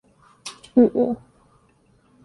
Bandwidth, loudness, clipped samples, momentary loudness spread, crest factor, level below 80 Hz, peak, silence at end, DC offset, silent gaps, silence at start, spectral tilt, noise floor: 11.5 kHz; -20 LUFS; under 0.1%; 21 LU; 20 dB; -60 dBFS; -4 dBFS; 1.1 s; under 0.1%; none; 0.45 s; -6.5 dB/octave; -59 dBFS